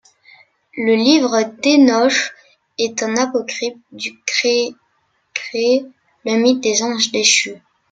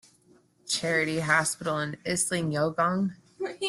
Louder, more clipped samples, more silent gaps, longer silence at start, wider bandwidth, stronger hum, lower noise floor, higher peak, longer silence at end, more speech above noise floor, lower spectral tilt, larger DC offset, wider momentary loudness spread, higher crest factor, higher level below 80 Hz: first, -16 LUFS vs -27 LUFS; neither; neither; about the same, 0.75 s vs 0.65 s; second, 9.4 kHz vs 12.5 kHz; neither; about the same, -64 dBFS vs -62 dBFS; first, 0 dBFS vs -8 dBFS; first, 0.35 s vs 0 s; first, 48 dB vs 34 dB; second, -2 dB/octave vs -3.5 dB/octave; neither; first, 14 LU vs 9 LU; about the same, 16 dB vs 20 dB; about the same, -68 dBFS vs -64 dBFS